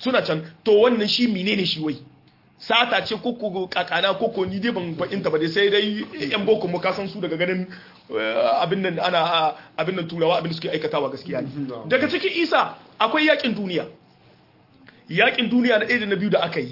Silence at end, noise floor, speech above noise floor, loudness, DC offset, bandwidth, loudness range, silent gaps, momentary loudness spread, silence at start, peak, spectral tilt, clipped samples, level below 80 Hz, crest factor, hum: 0 s; -54 dBFS; 33 dB; -22 LUFS; under 0.1%; 5.8 kHz; 2 LU; none; 10 LU; 0 s; -4 dBFS; -6 dB/octave; under 0.1%; -66 dBFS; 18 dB; none